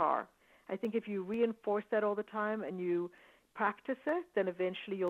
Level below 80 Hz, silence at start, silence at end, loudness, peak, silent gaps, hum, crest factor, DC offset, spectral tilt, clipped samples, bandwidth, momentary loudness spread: -80 dBFS; 0 s; 0 s; -36 LUFS; -18 dBFS; none; none; 18 dB; under 0.1%; -7.5 dB/octave; under 0.1%; 7.6 kHz; 6 LU